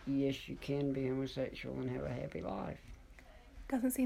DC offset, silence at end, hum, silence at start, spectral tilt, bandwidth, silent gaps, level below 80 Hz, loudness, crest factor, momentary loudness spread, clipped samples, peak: under 0.1%; 0 s; none; 0 s; -6 dB/octave; 16 kHz; none; -56 dBFS; -39 LUFS; 16 dB; 21 LU; under 0.1%; -24 dBFS